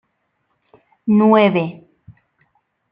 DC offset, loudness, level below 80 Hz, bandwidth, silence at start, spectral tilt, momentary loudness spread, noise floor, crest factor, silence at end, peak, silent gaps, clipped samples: under 0.1%; -15 LUFS; -64 dBFS; 5 kHz; 1.05 s; -10 dB/octave; 16 LU; -69 dBFS; 18 dB; 0.8 s; -2 dBFS; none; under 0.1%